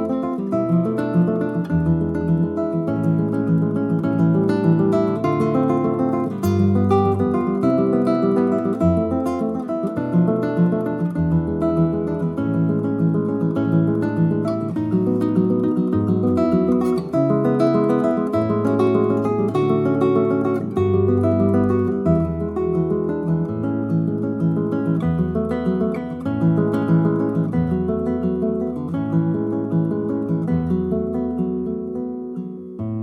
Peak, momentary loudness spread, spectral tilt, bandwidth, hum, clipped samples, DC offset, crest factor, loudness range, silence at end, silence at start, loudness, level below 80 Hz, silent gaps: -4 dBFS; 5 LU; -10 dB/octave; 10.5 kHz; none; under 0.1%; under 0.1%; 14 dB; 3 LU; 0 s; 0 s; -20 LUFS; -44 dBFS; none